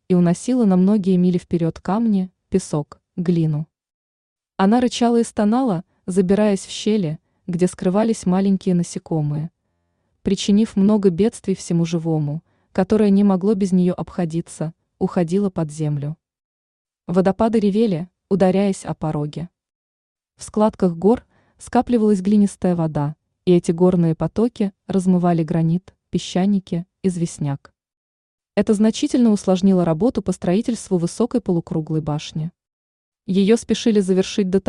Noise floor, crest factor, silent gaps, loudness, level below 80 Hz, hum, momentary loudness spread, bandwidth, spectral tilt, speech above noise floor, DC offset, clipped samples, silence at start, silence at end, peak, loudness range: -70 dBFS; 16 dB; 3.94-4.36 s, 16.45-16.85 s, 19.75-20.16 s, 27.97-28.38 s, 32.73-33.12 s; -19 LUFS; -50 dBFS; none; 11 LU; 11 kHz; -7 dB/octave; 52 dB; under 0.1%; under 0.1%; 0.1 s; 0.1 s; -4 dBFS; 4 LU